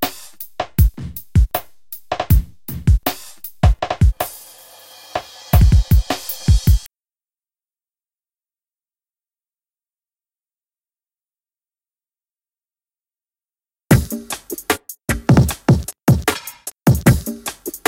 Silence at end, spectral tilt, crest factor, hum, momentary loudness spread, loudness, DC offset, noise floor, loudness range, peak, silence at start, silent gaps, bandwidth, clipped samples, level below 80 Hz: 0.1 s; -6 dB/octave; 20 dB; none; 14 LU; -18 LUFS; under 0.1%; under -90 dBFS; 6 LU; 0 dBFS; 0 s; none; 17 kHz; under 0.1%; -24 dBFS